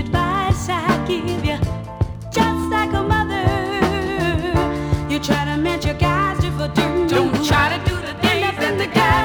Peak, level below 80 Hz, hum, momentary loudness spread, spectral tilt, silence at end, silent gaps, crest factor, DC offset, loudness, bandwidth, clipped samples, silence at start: -2 dBFS; -32 dBFS; none; 5 LU; -5.5 dB/octave; 0 s; none; 16 dB; under 0.1%; -19 LUFS; over 20 kHz; under 0.1%; 0 s